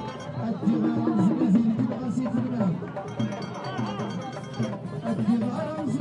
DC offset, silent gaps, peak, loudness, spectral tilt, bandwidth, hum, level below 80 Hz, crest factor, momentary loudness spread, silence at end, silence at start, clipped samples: under 0.1%; none; -12 dBFS; -27 LUFS; -8 dB/octave; 10.5 kHz; none; -64 dBFS; 14 dB; 10 LU; 0 s; 0 s; under 0.1%